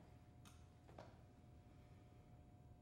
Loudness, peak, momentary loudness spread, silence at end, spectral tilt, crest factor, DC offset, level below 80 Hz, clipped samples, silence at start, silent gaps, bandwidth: -65 LUFS; -42 dBFS; 4 LU; 0 s; -6 dB/octave; 22 dB; under 0.1%; -72 dBFS; under 0.1%; 0 s; none; 16 kHz